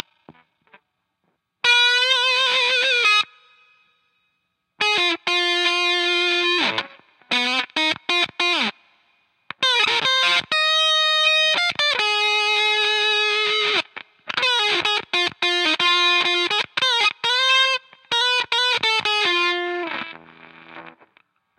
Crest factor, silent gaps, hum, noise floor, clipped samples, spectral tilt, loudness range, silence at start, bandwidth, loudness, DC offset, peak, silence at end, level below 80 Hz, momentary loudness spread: 16 dB; none; none; -73 dBFS; under 0.1%; -0.5 dB/octave; 4 LU; 0.3 s; 13.5 kHz; -18 LUFS; under 0.1%; -4 dBFS; 0.7 s; -74 dBFS; 8 LU